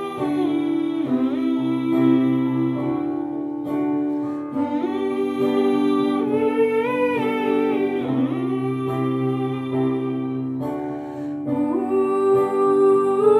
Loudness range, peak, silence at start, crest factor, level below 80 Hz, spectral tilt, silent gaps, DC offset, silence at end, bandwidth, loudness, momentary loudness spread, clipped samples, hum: 3 LU; -6 dBFS; 0 s; 14 dB; -64 dBFS; -8 dB/octave; none; under 0.1%; 0 s; 12.5 kHz; -21 LUFS; 8 LU; under 0.1%; none